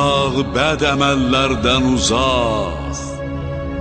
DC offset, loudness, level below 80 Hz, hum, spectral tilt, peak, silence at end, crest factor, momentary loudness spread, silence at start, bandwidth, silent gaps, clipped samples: under 0.1%; -17 LUFS; -30 dBFS; none; -4.5 dB/octave; -2 dBFS; 0 s; 16 dB; 10 LU; 0 s; 9.4 kHz; none; under 0.1%